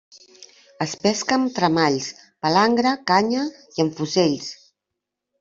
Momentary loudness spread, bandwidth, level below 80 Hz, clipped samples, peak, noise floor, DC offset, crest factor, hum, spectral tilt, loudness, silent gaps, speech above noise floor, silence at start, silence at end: 10 LU; 7.8 kHz; -62 dBFS; under 0.1%; -2 dBFS; -83 dBFS; under 0.1%; 20 dB; none; -4.5 dB/octave; -21 LUFS; none; 62 dB; 0.8 s; 0.85 s